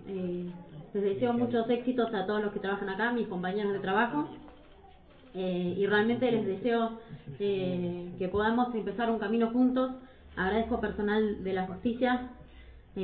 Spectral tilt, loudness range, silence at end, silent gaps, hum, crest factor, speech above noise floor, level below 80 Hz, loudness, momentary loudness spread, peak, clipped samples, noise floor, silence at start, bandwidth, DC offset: -10 dB/octave; 2 LU; 0 s; none; none; 16 dB; 25 dB; -56 dBFS; -30 LUFS; 11 LU; -14 dBFS; under 0.1%; -55 dBFS; 0 s; 4.7 kHz; under 0.1%